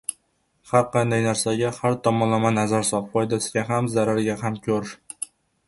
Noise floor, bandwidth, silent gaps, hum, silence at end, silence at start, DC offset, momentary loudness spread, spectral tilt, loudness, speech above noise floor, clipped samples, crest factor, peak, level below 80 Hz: -68 dBFS; 12 kHz; none; none; 0.4 s; 0.1 s; under 0.1%; 12 LU; -5 dB/octave; -23 LUFS; 46 dB; under 0.1%; 20 dB; -2 dBFS; -58 dBFS